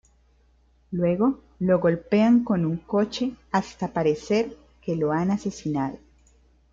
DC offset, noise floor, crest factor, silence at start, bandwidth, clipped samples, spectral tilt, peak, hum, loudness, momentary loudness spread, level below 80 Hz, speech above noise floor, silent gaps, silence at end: under 0.1%; -60 dBFS; 16 dB; 0.9 s; 7.6 kHz; under 0.1%; -7 dB/octave; -8 dBFS; none; -24 LUFS; 9 LU; -56 dBFS; 37 dB; none; 0.75 s